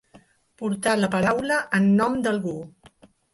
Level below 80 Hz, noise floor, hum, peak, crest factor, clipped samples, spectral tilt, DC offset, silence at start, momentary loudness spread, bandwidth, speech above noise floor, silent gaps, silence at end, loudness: -58 dBFS; -55 dBFS; none; -8 dBFS; 16 dB; under 0.1%; -5.5 dB/octave; under 0.1%; 0.6 s; 12 LU; 11.5 kHz; 33 dB; none; 0.65 s; -23 LUFS